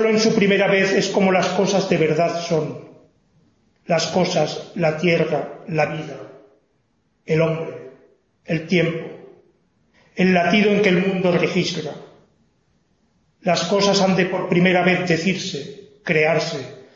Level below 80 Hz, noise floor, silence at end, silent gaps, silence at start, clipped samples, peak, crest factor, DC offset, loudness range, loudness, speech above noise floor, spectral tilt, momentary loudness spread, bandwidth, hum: -60 dBFS; -66 dBFS; 0.15 s; none; 0 s; under 0.1%; -2 dBFS; 18 dB; under 0.1%; 6 LU; -19 LUFS; 47 dB; -5 dB/octave; 15 LU; 7.8 kHz; none